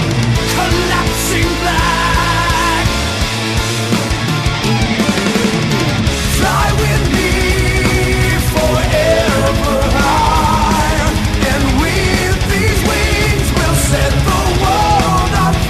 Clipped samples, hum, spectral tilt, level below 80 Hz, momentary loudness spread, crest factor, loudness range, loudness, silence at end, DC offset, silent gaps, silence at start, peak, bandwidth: under 0.1%; none; -4.5 dB/octave; -20 dBFS; 3 LU; 12 dB; 2 LU; -13 LUFS; 0 s; under 0.1%; none; 0 s; -2 dBFS; 14 kHz